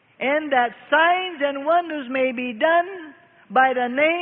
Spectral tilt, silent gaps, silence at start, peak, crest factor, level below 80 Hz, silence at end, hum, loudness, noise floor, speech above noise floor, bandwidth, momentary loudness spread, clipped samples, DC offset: -8 dB/octave; none; 0.2 s; -6 dBFS; 16 dB; -74 dBFS; 0 s; none; -20 LUFS; -44 dBFS; 23 dB; 3.9 kHz; 6 LU; under 0.1%; under 0.1%